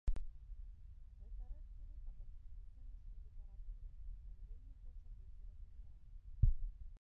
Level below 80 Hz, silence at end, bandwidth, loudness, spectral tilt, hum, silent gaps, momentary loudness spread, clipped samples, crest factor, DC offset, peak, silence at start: -46 dBFS; 0.05 s; 2 kHz; -51 LUFS; -10 dB/octave; none; none; 18 LU; under 0.1%; 24 dB; under 0.1%; -20 dBFS; 0.05 s